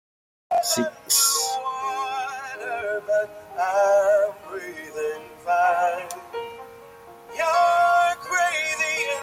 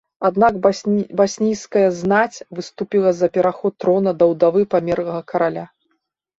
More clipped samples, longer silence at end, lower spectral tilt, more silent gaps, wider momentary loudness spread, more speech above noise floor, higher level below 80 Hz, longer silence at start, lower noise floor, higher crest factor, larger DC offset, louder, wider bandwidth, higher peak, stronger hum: neither; second, 0 s vs 0.7 s; second, -0.5 dB/octave vs -6 dB/octave; neither; first, 16 LU vs 8 LU; second, 23 dB vs 53 dB; second, -68 dBFS vs -56 dBFS; first, 0.5 s vs 0.2 s; second, -45 dBFS vs -71 dBFS; about the same, 18 dB vs 16 dB; neither; second, -22 LUFS vs -18 LUFS; first, 16.5 kHz vs 8 kHz; second, -6 dBFS vs -2 dBFS; neither